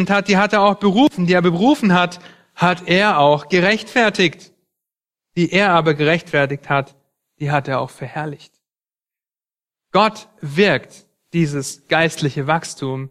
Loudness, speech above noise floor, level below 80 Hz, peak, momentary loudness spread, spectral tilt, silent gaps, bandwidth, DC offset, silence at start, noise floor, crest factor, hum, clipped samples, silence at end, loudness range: -17 LUFS; over 73 dB; -56 dBFS; 0 dBFS; 12 LU; -5.5 dB/octave; none; 13.5 kHz; under 0.1%; 0 s; under -90 dBFS; 18 dB; none; under 0.1%; 0 s; 8 LU